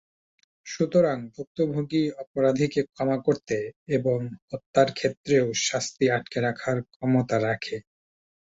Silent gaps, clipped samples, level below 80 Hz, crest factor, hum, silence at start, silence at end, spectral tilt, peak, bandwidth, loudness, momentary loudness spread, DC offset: 1.47-1.55 s, 2.27-2.34 s, 3.76-3.86 s, 4.42-4.48 s, 4.66-4.73 s, 5.17-5.24 s, 6.96-7.00 s; under 0.1%; -62 dBFS; 20 dB; none; 0.65 s; 0.75 s; -5 dB/octave; -6 dBFS; 8 kHz; -26 LUFS; 8 LU; under 0.1%